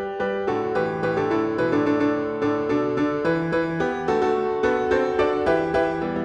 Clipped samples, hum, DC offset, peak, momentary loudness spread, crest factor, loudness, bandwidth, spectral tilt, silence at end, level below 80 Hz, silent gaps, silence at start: under 0.1%; none; under 0.1%; -8 dBFS; 3 LU; 14 dB; -23 LUFS; 9.2 kHz; -7 dB/octave; 0 s; -50 dBFS; none; 0 s